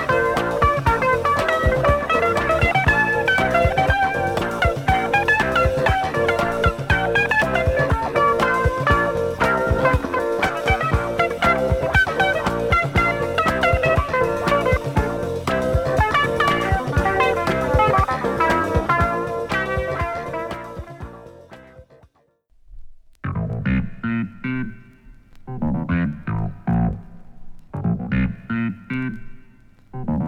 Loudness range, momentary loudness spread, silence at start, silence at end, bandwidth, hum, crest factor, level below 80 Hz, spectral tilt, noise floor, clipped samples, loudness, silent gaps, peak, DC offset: 10 LU; 10 LU; 0 s; 0 s; 17 kHz; none; 18 dB; -32 dBFS; -6 dB/octave; -60 dBFS; under 0.1%; -20 LUFS; none; -4 dBFS; under 0.1%